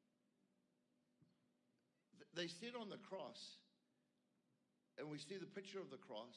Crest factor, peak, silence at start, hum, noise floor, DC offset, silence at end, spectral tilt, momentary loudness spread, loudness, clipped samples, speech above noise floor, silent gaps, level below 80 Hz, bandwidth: 24 dB; -34 dBFS; 1.2 s; none; -85 dBFS; under 0.1%; 0 s; -4 dB/octave; 9 LU; -53 LUFS; under 0.1%; 33 dB; none; under -90 dBFS; 10.5 kHz